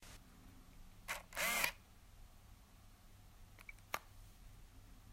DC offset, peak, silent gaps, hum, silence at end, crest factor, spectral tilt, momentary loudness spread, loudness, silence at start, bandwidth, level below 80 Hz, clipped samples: under 0.1%; -18 dBFS; none; none; 0 s; 30 dB; -1 dB/octave; 26 LU; -41 LUFS; 0 s; 16 kHz; -62 dBFS; under 0.1%